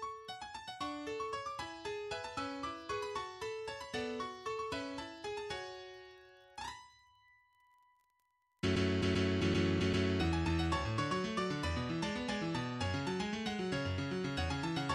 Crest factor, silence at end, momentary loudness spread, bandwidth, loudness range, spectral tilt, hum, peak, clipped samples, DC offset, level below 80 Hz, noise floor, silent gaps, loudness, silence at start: 16 dB; 0 s; 13 LU; 12 kHz; 11 LU; -5.5 dB/octave; none; -20 dBFS; under 0.1%; under 0.1%; -54 dBFS; -79 dBFS; none; -38 LUFS; 0 s